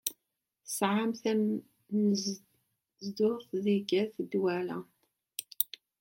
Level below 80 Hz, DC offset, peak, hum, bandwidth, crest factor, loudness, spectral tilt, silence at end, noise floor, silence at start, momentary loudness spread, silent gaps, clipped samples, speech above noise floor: -82 dBFS; under 0.1%; -8 dBFS; none; 16.5 kHz; 26 dB; -32 LUFS; -5 dB/octave; 0.35 s; -85 dBFS; 0.05 s; 13 LU; none; under 0.1%; 54 dB